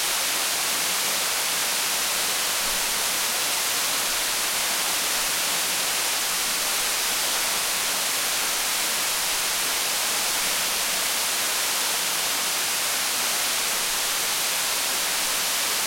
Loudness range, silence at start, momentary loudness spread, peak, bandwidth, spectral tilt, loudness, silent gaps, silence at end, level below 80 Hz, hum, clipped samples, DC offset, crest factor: 0 LU; 0 s; 0 LU; -12 dBFS; 16.5 kHz; 1.5 dB/octave; -22 LUFS; none; 0 s; -56 dBFS; none; under 0.1%; under 0.1%; 14 dB